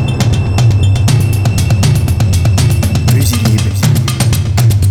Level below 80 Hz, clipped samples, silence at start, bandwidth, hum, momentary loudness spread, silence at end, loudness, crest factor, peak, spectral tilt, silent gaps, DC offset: -22 dBFS; under 0.1%; 0 s; 17.5 kHz; none; 2 LU; 0 s; -11 LUFS; 10 dB; 0 dBFS; -5.5 dB/octave; none; under 0.1%